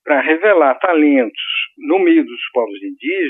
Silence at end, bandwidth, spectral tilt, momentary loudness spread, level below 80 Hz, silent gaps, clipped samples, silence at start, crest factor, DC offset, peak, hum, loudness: 0 s; 3.9 kHz; -7 dB/octave; 8 LU; -78 dBFS; none; under 0.1%; 0.05 s; 14 dB; under 0.1%; 0 dBFS; none; -15 LUFS